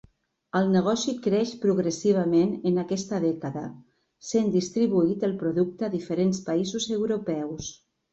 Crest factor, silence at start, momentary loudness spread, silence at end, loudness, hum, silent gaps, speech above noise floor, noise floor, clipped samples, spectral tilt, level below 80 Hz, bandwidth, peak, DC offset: 14 dB; 0.55 s; 9 LU; 0.4 s; -26 LUFS; none; none; 30 dB; -55 dBFS; under 0.1%; -6 dB/octave; -62 dBFS; 8 kHz; -10 dBFS; under 0.1%